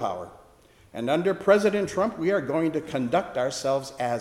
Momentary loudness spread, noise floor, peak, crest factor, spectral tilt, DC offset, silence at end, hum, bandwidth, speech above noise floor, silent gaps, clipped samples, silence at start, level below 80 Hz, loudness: 12 LU; -55 dBFS; -8 dBFS; 18 dB; -5.5 dB/octave; under 0.1%; 0 s; none; 14 kHz; 30 dB; none; under 0.1%; 0 s; -60 dBFS; -25 LUFS